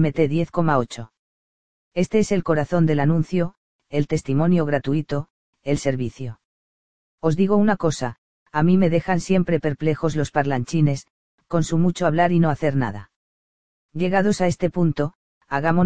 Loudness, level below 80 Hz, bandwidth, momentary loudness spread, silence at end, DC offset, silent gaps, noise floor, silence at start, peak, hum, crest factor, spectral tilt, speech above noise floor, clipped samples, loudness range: -21 LUFS; -48 dBFS; 9.4 kHz; 11 LU; 0 s; 2%; 1.19-1.91 s, 3.57-3.79 s, 5.30-5.53 s, 6.45-7.18 s, 8.18-8.46 s, 11.10-11.38 s, 13.16-13.89 s, 15.15-15.41 s; under -90 dBFS; 0 s; -4 dBFS; none; 18 dB; -7 dB/octave; over 70 dB; under 0.1%; 3 LU